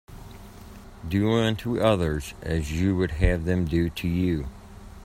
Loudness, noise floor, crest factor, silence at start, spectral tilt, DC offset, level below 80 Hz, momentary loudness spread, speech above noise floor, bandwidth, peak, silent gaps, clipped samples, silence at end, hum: -25 LUFS; -44 dBFS; 20 dB; 0.1 s; -7 dB/octave; under 0.1%; -36 dBFS; 22 LU; 20 dB; 16 kHz; -6 dBFS; none; under 0.1%; 0 s; none